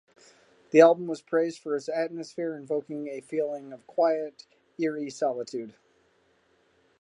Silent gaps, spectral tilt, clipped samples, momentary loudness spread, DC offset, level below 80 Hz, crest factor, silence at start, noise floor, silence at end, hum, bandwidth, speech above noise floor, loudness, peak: none; -5.5 dB/octave; under 0.1%; 17 LU; under 0.1%; -84 dBFS; 24 dB; 0.75 s; -66 dBFS; 1.3 s; none; 10.5 kHz; 40 dB; -27 LUFS; -4 dBFS